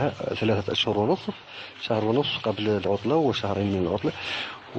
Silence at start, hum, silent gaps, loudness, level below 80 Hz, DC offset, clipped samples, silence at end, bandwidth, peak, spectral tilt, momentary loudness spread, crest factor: 0 s; none; none; -26 LUFS; -58 dBFS; under 0.1%; under 0.1%; 0 s; 8.6 kHz; -10 dBFS; -6.5 dB/octave; 7 LU; 14 dB